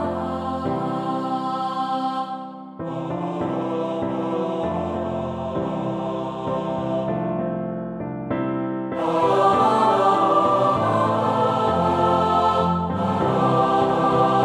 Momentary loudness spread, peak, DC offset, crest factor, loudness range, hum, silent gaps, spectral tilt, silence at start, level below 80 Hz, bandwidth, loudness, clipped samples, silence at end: 10 LU; -6 dBFS; under 0.1%; 16 dB; 7 LU; none; none; -7.5 dB/octave; 0 s; -50 dBFS; 11.5 kHz; -22 LUFS; under 0.1%; 0 s